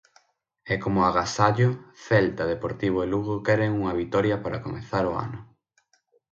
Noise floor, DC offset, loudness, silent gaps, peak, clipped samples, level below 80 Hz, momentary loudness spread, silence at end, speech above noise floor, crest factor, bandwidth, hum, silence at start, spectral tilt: -68 dBFS; under 0.1%; -25 LUFS; none; -4 dBFS; under 0.1%; -50 dBFS; 10 LU; 0.85 s; 43 dB; 22 dB; 8 kHz; none; 0.65 s; -6.5 dB/octave